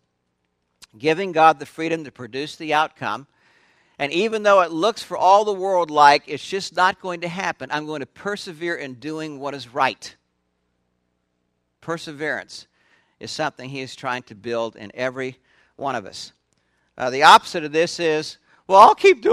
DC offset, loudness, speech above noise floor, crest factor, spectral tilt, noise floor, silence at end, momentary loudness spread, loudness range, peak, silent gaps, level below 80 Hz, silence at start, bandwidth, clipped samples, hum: under 0.1%; -20 LUFS; 53 dB; 22 dB; -3.5 dB/octave; -73 dBFS; 0 s; 18 LU; 12 LU; 0 dBFS; none; -66 dBFS; 1 s; 15 kHz; under 0.1%; 60 Hz at -65 dBFS